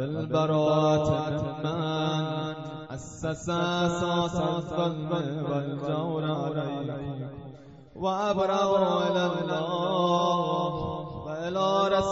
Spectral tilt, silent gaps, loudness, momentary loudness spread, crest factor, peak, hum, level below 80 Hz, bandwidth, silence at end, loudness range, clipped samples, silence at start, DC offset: -5.5 dB/octave; none; -28 LUFS; 11 LU; 16 dB; -12 dBFS; none; -54 dBFS; 8 kHz; 0 s; 4 LU; under 0.1%; 0 s; under 0.1%